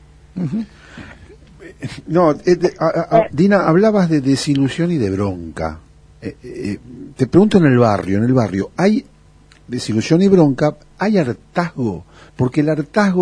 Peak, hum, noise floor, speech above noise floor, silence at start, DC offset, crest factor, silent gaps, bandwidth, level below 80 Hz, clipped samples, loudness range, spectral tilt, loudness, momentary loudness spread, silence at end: 0 dBFS; none; -47 dBFS; 31 dB; 0.35 s; under 0.1%; 16 dB; none; 10.5 kHz; -46 dBFS; under 0.1%; 4 LU; -7 dB/octave; -16 LUFS; 18 LU; 0 s